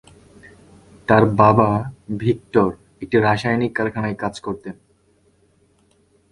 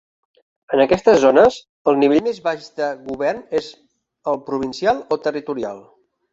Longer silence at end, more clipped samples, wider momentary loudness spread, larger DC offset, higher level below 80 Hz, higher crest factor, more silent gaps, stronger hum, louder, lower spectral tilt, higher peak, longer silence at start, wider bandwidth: first, 1.6 s vs 0.5 s; neither; first, 16 LU vs 13 LU; neither; first, -48 dBFS vs -54 dBFS; about the same, 20 dB vs 18 dB; second, none vs 1.69-1.85 s; neither; about the same, -19 LUFS vs -18 LUFS; first, -7.5 dB/octave vs -5.5 dB/octave; about the same, 0 dBFS vs -2 dBFS; first, 1.1 s vs 0.7 s; first, 11 kHz vs 7.8 kHz